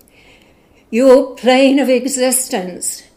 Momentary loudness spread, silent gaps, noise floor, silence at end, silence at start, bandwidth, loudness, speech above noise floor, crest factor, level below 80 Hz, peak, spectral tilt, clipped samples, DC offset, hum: 11 LU; none; -49 dBFS; 0.15 s; 0.9 s; 16 kHz; -13 LUFS; 37 dB; 14 dB; -56 dBFS; 0 dBFS; -3 dB/octave; 0.1%; under 0.1%; none